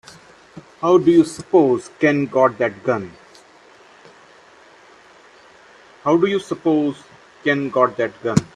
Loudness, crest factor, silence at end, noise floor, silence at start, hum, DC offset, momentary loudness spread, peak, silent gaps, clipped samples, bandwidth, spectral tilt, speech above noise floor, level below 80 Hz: -18 LUFS; 20 dB; 0.1 s; -48 dBFS; 0.55 s; none; under 0.1%; 9 LU; 0 dBFS; none; under 0.1%; 11 kHz; -6.5 dB/octave; 31 dB; -58 dBFS